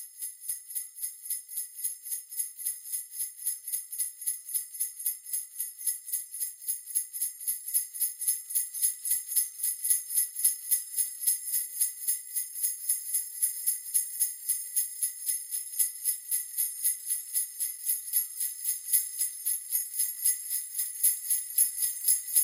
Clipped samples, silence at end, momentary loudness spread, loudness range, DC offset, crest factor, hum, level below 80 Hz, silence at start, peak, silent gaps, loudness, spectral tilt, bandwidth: under 0.1%; 0 s; 8 LU; 5 LU; under 0.1%; 24 dB; none; under -90 dBFS; 0 s; -8 dBFS; none; -29 LUFS; 6 dB/octave; 17 kHz